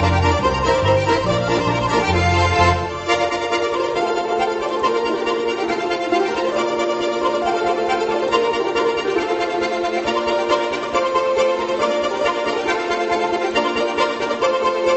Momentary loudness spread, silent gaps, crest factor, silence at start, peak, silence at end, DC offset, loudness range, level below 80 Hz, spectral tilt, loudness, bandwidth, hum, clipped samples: 4 LU; none; 16 dB; 0 s; -2 dBFS; 0 s; under 0.1%; 2 LU; -34 dBFS; -5 dB/octave; -19 LUFS; 8.4 kHz; none; under 0.1%